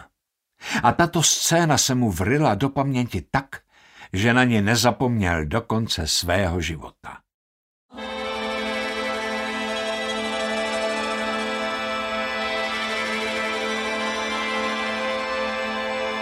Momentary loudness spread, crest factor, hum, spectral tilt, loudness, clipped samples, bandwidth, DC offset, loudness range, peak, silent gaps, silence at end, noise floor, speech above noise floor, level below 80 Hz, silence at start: 9 LU; 22 dB; none; -3.5 dB/octave; -23 LUFS; under 0.1%; 16 kHz; under 0.1%; 6 LU; -2 dBFS; 7.34-7.89 s; 0 s; -77 dBFS; 56 dB; -46 dBFS; 0 s